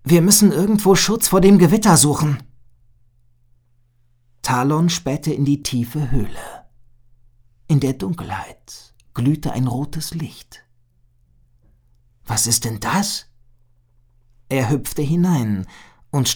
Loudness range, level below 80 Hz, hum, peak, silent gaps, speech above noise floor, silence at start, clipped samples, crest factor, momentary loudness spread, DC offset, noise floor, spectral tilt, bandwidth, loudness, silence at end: 10 LU; -40 dBFS; none; 0 dBFS; none; 40 dB; 0.05 s; under 0.1%; 20 dB; 18 LU; under 0.1%; -57 dBFS; -5 dB/octave; over 20 kHz; -17 LUFS; 0 s